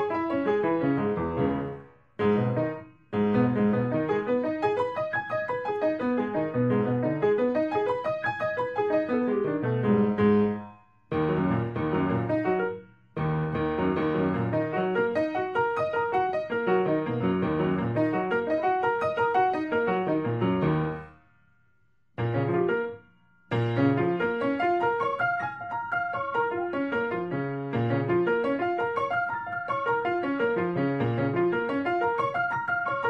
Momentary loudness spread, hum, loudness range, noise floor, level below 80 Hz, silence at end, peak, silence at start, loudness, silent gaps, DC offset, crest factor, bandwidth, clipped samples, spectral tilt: 6 LU; none; 2 LU; -70 dBFS; -56 dBFS; 0 s; -10 dBFS; 0 s; -27 LUFS; none; under 0.1%; 16 dB; 7.4 kHz; under 0.1%; -9 dB/octave